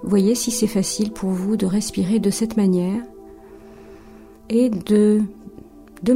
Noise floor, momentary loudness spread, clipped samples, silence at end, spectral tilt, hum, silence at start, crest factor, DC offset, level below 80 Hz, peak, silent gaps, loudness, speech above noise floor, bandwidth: -43 dBFS; 9 LU; under 0.1%; 0 s; -5.5 dB/octave; none; 0 s; 14 dB; under 0.1%; -50 dBFS; -6 dBFS; none; -20 LUFS; 25 dB; 16 kHz